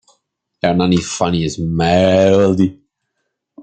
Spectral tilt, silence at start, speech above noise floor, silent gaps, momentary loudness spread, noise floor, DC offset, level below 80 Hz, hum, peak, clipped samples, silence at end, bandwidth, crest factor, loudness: -6 dB/octave; 0.65 s; 59 dB; none; 8 LU; -73 dBFS; under 0.1%; -44 dBFS; none; 0 dBFS; under 0.1%; 0 s; 9.2 kHz; 16 dB; -15 LUFS